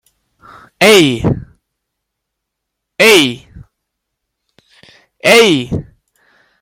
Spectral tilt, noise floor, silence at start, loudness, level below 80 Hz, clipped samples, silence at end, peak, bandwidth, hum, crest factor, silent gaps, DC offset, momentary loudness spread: -3.5 dB/octave; -76 dBFS; 0.8 s; -10 LUFS; -42 dBFS; under 0.1%; 0.8 s; 0 dBFS; 17 kHz; none; 14 dB; none; under 0.1%; 16 LU